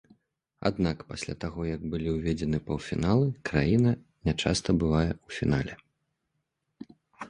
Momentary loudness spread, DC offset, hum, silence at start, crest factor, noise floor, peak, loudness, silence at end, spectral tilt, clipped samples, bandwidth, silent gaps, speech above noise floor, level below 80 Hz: 9 LU; under 0.1%; none; 0.6 s; 20 dB; -80 dBFS; -8 dBFS; -29 LUFS; 0 s; -6.5 dB/octave; under 0.1%; 11 kHz; none; 53 dB; -44 dBFS